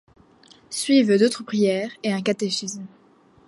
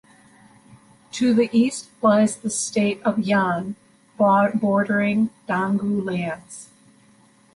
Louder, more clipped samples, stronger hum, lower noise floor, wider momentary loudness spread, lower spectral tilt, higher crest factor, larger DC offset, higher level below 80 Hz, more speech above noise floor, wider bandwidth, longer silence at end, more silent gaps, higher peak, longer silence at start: about the same, -22 LUFS vs -21 LUFS; neither; neither; about the same, -53 dBFS vs -55 dBFS; about the same, 15 LU vs 14 LU; about the same, -4.5 dB/octave vs -5.5 dB/octave; about the same, 16 dB vs 16 dB; neither; second, -70 dBFS vs -64 dBFS; about the same, 32 dB vs 35 dB; about the same, 12 kHz vs 11.5 kHz; second, 0.6 s vs 0.9 s; neither; about the same, -6 dBFS vs -6 dBFS; second, 0.7 s vs 1.15 s